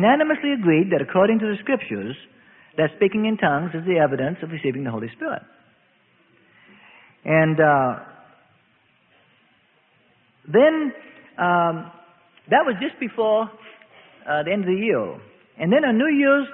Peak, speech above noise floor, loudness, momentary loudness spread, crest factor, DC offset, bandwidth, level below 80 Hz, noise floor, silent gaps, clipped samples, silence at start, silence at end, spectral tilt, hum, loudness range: -4 dBFS; 41 dB; -21 LUFS; 15 LU; 18 dB; under 0.1%; 3.9 kHz; -64 dBFS; -61 dBFS; none; under 0.1%; 0 s; 0 s; -11 dB/octave; none; 4 LU